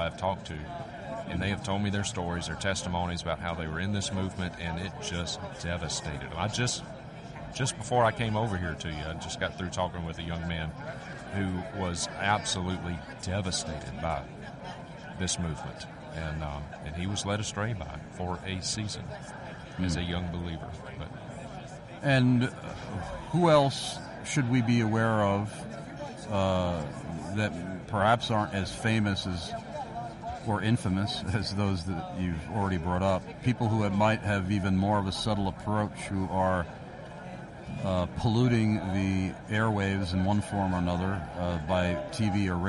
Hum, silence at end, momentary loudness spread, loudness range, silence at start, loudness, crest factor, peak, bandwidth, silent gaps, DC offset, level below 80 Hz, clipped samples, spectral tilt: none; 0 s; 14 LU; 6 LU; 0 s; -30 LUFS; 20 dB; -10 dBFS; 11.5 kHz; none; under 0.1%; -48 dBFS; under 0.1%; -5.5 dB/octave